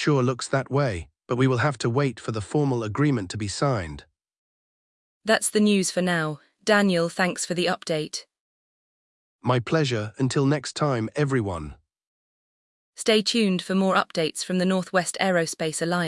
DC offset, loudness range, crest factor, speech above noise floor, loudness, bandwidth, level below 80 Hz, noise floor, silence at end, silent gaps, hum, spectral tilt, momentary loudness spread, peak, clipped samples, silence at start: under 0.1%; 4 LU; 20 dB; over 66 dB; -24 LUFS; 12 kHz; -56 dBFS; under -90 dBFS; 0 s; 4.38-5.21 s, 8.40-9.39 s, 12.07-12.93 s; none; -5 dB/octave; 10 LU; -6 dBFS; under 0.1%; 0 s